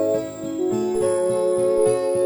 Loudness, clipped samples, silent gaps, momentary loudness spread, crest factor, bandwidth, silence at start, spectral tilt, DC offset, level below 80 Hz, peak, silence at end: -21 LUFS; under 0.1%; none; 7 LU; 12 dB; over 20 kHz; 0 s; -5.5 dB/octave; under 0.1%; -54 dBFS; -8 dBFS; 0 s